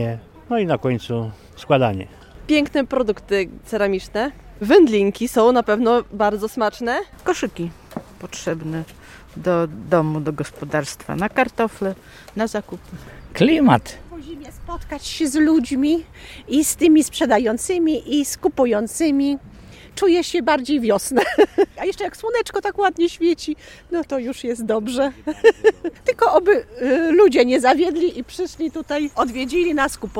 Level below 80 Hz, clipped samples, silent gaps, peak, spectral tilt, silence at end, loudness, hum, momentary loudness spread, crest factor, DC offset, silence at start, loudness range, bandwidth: -46 dBFS; under 0.1%; none; 0 dBFS; -5 dB/octave; 0 s; -19 LUFS; none; 17 LU; 18 dB; under 0.1%; 0 s; 6 LU; 16.5 kHz